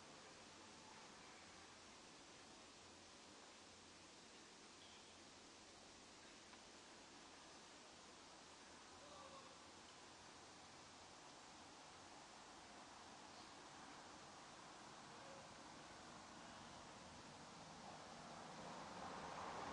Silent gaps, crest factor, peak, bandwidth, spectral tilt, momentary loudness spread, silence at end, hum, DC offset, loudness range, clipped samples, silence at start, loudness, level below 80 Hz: none; 18 dB; -42 dBFS; 11 kHz; -2.5 dB/octave; 6 LU; 0 s; none; under 0.1%; 4 LU; under 0.1%; 0 s; -59 LUFS; -84 dBFS